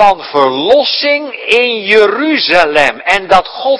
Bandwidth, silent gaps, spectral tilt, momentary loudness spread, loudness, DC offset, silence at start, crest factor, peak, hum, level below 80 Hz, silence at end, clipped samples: 11 kHz; none; -3.5 dB/octave; 4 LU; -10 LUFS; under 0.1%; 0 s; 10 dB; 0 dBFS; none; -44 dBFS; 0 s; 2%